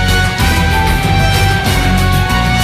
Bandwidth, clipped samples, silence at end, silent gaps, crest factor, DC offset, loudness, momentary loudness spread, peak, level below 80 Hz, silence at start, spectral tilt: 15 kHz; under 0.1%; 0 s; none; 10 dB; under 0.1%; -12 LUFS; 1 LU; 0 dBFS; -16 dBFS; 0 s; -4.5 dB/octave